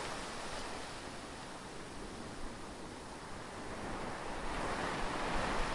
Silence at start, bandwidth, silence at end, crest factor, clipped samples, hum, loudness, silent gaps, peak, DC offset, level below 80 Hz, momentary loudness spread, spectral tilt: 0 s; 11.5 kHz; 0 s; 18 dB; under 0.1%; none; -42 LUFS; none; -24 dBFS; under 0.1%; -50 dBFS; 10 LU; -4 dB/octave